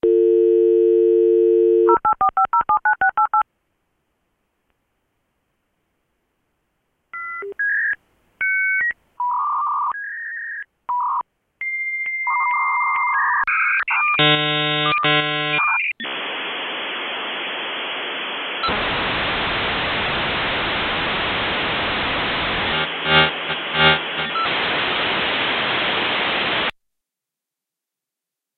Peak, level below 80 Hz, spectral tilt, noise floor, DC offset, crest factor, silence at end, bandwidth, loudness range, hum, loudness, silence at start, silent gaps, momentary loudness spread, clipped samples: -2 dBFS; -48 dBFS; -7.5 dB/octave; -86 dBFS; under 0.1%; 18 dB; 1.85 s; 4.7 kHz; 7 LU; none; -19 LUFS; 0.05 s; none; 9 LU; under 0.1%